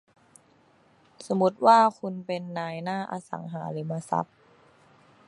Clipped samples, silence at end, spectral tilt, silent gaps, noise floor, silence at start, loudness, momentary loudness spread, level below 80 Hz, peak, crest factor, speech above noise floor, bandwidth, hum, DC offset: under 0.1%; 1.05 s; -6.5 dB/octave; none; -61 dBFS; 1.2 s; -26 LUFS; 17 LU; -76 dBFS; -6 dBFS; 22 dB; 35 dB; 11.5 kHz; none; under 0.1%